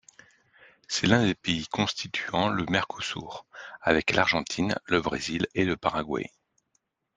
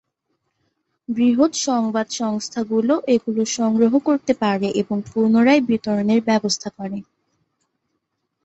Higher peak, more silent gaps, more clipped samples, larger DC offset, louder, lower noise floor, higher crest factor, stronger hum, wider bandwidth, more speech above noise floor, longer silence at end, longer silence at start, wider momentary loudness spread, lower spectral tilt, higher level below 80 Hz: about the same, -4 dBFS vs -4 dBFS; neither; neither; neither; second, -27 LUFS vs -19 LUFS; about the same, -75 dBFS vs -75 dBFS; first, 24 dB vs 16 dB; neither; first, 10 kHz vs 8.2 kHz; second, 48 dB vs 56 dB; second, 0.9 s vs 1.45 s; second, 0.9 s vs 1.1 s; about the same, 10 LU vs 9 LU; about the same, -4.5 dB/octave vs -4.5 dB/octave; first, -56 dBFS vs -62 dBFS